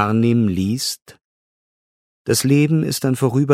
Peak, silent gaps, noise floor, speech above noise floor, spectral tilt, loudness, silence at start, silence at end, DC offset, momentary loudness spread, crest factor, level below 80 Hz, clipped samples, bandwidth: 0 dBFS; 1.02-1.06 s, 1.24-2.25 s; under -90 dBFS; over 73 dB; -5.5 dB/octave; -18 LUFS; 0 s; 0 s; under 0.1%; 8 LU; 18 dB; -54 dBFS; under 0.1%; 16 kHz